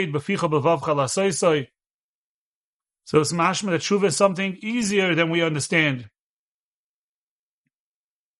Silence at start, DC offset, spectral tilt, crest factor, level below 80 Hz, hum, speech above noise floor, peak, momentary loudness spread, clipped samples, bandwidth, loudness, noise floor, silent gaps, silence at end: 0 s; under 0.1%; -4.5 dB/octave; 20 dB; -64 dBFS; none; over 69 dB; -4 dBFS; 6 LU; under 0.1%; 11.5 kHz; -21 LUFS; under -90 dBFS; 1.90-2.80 s; 2.3 s